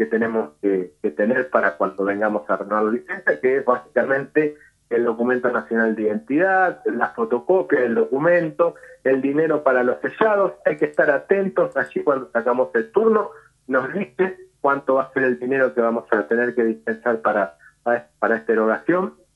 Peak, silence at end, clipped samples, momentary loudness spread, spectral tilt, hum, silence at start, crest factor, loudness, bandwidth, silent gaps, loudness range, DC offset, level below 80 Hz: -2 dBFS; 0.25 s; under 0.1%; 5 LU; -8 dB/octave; none; 0 s; 18 dB; -21 LUFS; 8.6 kHz; none; 2 LU; under 0.1%; -68 dBFS